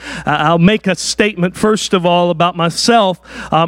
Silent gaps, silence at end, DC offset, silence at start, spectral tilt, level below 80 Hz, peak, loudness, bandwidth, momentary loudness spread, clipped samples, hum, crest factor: none; 0 s; under 0.1%; 0 s; -4.5 dB/octave; -44 dBFS; 0 dBFS; -13 LUFS; 14.5 kHz; 6 LU; under 0.1%; none; 14 dB